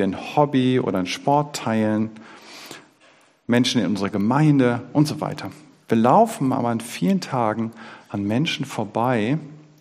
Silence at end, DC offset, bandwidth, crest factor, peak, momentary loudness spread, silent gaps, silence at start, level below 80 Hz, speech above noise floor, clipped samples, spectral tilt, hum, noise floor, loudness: 0.2 s; under 0.1%; 15.5 kHz; 18 dB; -2 dBFS; 15 LU; none; 0 s; -64 dBFS; 35 dB; under 0.1%; -6 dB/octave; none; -55 dBFS; -21 LUFS